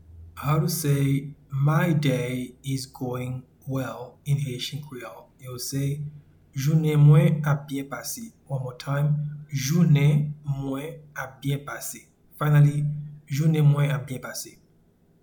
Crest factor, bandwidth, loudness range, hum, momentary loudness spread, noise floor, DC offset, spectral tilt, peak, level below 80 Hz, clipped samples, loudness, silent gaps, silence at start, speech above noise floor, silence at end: 18 dB; 19 kHz; 8 LU; none; 17 LU; -60 dBFS; under 0.1%; -6.5 dB/octave; -6 dBFS; -56 dBFS; under 0.1%; -25 LUFS; none; 0.1 s; 36 dB; 0.7 s